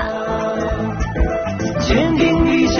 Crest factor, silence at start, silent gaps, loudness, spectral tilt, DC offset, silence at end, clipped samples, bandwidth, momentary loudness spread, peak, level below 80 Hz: 12 dB; 0 s; none; -18 LUFS; -5 dB/octave; under 0.1%; 0 s; under 0.1%; 6.8 kHz; 7 LU; -4 dBFS; -26 dBFS